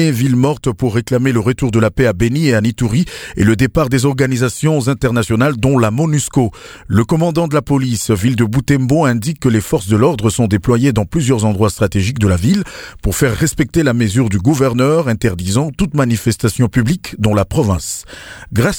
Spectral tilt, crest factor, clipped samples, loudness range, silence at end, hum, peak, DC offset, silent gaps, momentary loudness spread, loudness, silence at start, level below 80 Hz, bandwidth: -6 dB/octave; 14 dB; under 0.1%; 1 LU; 0 s; none; 0 dBFS; under 0.1%; none; 4 LU; -14 LUFS; 0 s; -34 dBFS; 18 kHz